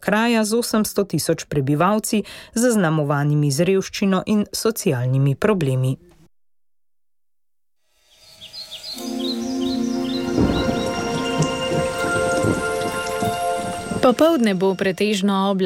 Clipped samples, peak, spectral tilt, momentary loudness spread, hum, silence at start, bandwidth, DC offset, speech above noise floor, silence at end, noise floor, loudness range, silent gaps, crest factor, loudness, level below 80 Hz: under 0.1%; -4 dBFS; -5.5 dB/octave; 7 LU; none; 0 s; 17 kHz; under 0.1%; 66 dB; 0 s; -85 dBFS; 9 LU; none; 16 dB; -20 LUFS; -44 dBFS